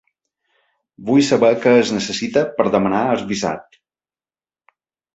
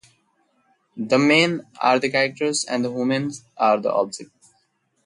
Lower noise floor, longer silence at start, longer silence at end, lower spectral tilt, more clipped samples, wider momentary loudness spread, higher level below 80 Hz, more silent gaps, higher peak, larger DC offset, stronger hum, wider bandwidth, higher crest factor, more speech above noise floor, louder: first, under -90 dBFS vs -67 dBFS; about the same, 1 s vs 0.95 s; first, 1.55 s vs 0.8 s; about the same, -5 dB/octave vs -4 dB/octave; neither; about the same, 9 LU vs 11 LU; first, -56 dBFS vs -70 dBFS; neither; about the same, -2 dBFS vs -4 dBFS; neither; neither; second, 8.2 kHz vs 11.5 kHz; about the same, 18 dB vs 18 dB; first, over 74 dB vs 47 dB; first, -17 LUFS vs -20 LUFS